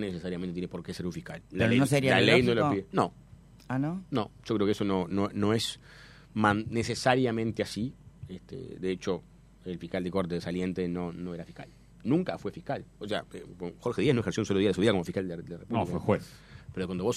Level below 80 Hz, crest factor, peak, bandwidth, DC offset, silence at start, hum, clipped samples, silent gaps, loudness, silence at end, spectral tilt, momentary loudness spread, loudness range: -56 dBFS; 24 dB; -6 dBFS; 14.5 kHz; under 0.1%; 0 s; none; under 0.1%; none; -30 LUFS; 0 s; -6 dB/octave; 16 LU; 8 LU